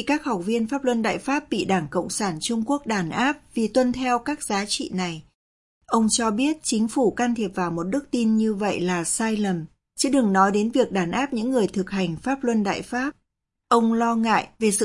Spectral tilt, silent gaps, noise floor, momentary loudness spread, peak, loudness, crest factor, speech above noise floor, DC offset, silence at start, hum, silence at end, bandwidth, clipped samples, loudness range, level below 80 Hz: -4.5 dB/octave; 5.34-5.81 s; -78 dBFS; 6 LU; -6 dBFS; -23 LUFS; 18 dB; 55 dB; under 0.1%; 0 s; none; 0 s; 11.5 kHz; under 0.1%; 2 LU; -56 dBFS